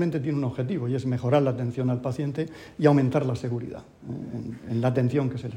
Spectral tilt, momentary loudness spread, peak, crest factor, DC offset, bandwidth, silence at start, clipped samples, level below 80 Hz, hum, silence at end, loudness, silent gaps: -8.5 dB/octave; 13 LU; -4 dBFS; 22 dB; under 0.1%; 10 kHz; 0 s; under 0.1%; -58 dBFS; none; 0 s; -26 LUFS; none